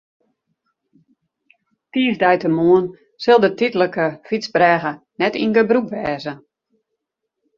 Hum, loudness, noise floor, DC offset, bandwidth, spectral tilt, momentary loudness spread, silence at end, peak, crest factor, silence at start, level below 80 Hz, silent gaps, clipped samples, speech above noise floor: none; -18 LUFS; -78 dBFS; under 0.1%; 7.2 kHz; -6.5 dB/octave; 12 LU; 1.2 s; -2 dBFS; 18 dB; 1.95 s; -60 dBFS; none; under 0.1%; 61 dB